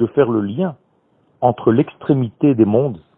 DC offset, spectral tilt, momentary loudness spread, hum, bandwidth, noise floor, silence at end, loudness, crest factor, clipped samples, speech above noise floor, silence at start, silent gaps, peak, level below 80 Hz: under 0.1%; -13 dB/octave; 6 LU; none; 3.9 kHz; -59 dBFS; 0.2 s; -17 LUFS; 16 dB; under 0.1%; 43 dB; 0 s; none; 0 dBFS; -56 dBFS